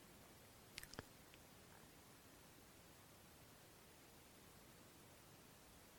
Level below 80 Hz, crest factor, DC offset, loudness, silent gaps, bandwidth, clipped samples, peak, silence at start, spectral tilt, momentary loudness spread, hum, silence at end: -76 dBFS; 34 dB; under 0.1%; -62 LUFS; none; 19 kHz; under 0.1%; -28 dBFS; 0 s; -3 dB/octave; 7 LU; none; 0 s